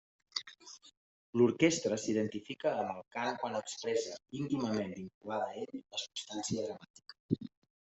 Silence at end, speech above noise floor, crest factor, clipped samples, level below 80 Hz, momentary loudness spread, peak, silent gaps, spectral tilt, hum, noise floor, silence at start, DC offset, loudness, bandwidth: 0.35 s; 20 dB; 22 dB; under 0.1%; -74 dBFS; 19 LU; -14 dBFS; 0.97-1.33 s, 5.14-5.21 s, 6.90-6.94 s, 7.20-7.29 s; -4.5 dB/octave; none; -55 dBFS; 0.35 s; under 0.1%; -36 LUFS; 8.2 kHz